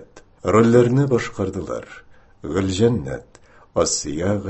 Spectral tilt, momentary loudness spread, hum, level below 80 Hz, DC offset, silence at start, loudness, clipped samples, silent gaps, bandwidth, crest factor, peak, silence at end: -5.5 dB/octave; 16 LU; none; -42 dBFS; under 0.1%; 0 s; -20 LUFS; under 0.1%; none; 8.6 kHz; 18 dB; -2 dBFS; 0 s